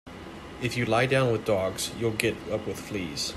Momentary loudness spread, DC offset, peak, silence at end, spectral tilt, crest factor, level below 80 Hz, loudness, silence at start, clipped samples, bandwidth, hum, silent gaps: 11 LU; under 0.1%; -6 dBFS; 0 s; -4.5 dB/octave; 24 dB; -54 dBFS; -27 LUFS; 0.05 s; under 0.1%; 15 kHz; none; none